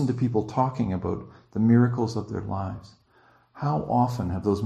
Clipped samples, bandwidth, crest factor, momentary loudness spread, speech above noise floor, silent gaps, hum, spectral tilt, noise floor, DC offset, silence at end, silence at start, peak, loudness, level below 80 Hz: under 0.1%; 8.8 kHz; 18 dB; 13 LU; 35 dB; none; none; -8.5 dB/octave; -60 dBFS; under 0.1%; 0 s; 0 s; -8 dBFS; -26 LUFS; -52 dBFS